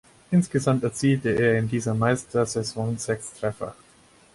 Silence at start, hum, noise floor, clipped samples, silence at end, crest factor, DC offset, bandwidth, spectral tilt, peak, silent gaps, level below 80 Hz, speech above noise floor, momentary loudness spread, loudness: 0.3 s; none; -55 dBFS; under 0.1%; 0.6 s; 16 dB; under 0.1%; 11.5 kHz; -6 dB/octave; -8 dBFS; none; -56 dBFS; 32 dB; 9 LU; -24 LUFS